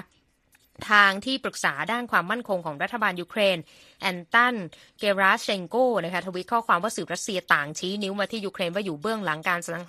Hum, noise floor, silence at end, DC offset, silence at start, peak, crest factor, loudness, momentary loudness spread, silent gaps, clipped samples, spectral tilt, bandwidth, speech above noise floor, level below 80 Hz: none; -64 dBFS; 0 s; under 0.1%; 0.8 s; -2 dBFS; 24 dB; -25 LUFS; 9 LU; none; under 0.1%; -3.5 dB/octave; 15 kHz; 39 dB; -68 dBFS